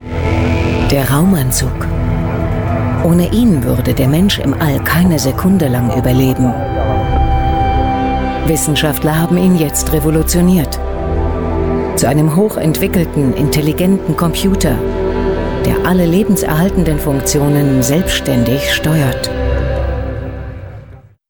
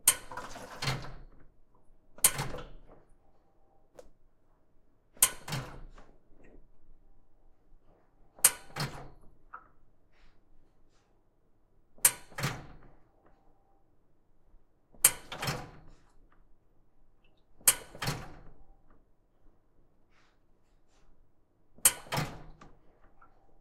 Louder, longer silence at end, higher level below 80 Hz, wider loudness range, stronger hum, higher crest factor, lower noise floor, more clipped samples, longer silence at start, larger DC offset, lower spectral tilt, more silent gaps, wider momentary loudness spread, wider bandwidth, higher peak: first, -13 LUFS vs -29 LUFS; first, 0.3 s vs 0.05 s; first, -22 dBFS vs -56 dBFS; about the same, 2 LU vs 2 LU; neither; second, 10 dB vs 36 dB; second, -36 dBFS vs -66 dBFS; neither; about the same, 0 s vs 0.05 s; neither; first, -5.5 dB/octave vs -1 dB/octave; neither; second, 5 LU vs 25 LU; first, over 20 kHz vs 16.5 kHz; about the same, -2 dBFS vs -2 dBFS